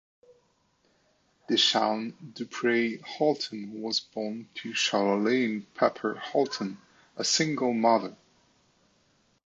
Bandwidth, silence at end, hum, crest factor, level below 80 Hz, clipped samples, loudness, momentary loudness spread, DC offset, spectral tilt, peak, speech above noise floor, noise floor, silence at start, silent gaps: 8.2 kHz; 1.3 s; none; 20 dB; -78 dBFS; under 0.1%; -27 LUFS; 14 LU; under 0.1%; -3 dB/octave; -10 dBFS; 41 dB; -69 dBFS; 1.5 s; none